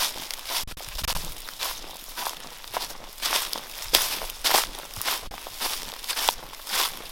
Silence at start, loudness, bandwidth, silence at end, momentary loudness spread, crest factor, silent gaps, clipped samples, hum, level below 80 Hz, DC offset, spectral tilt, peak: 0 s; -27 LUFS; 17 kHz; 0 s; 13 LU; 30 dB; none; under 0.1%; none; -44 dBFS; under 0.1%; 0 dB/octave; 0 dBFS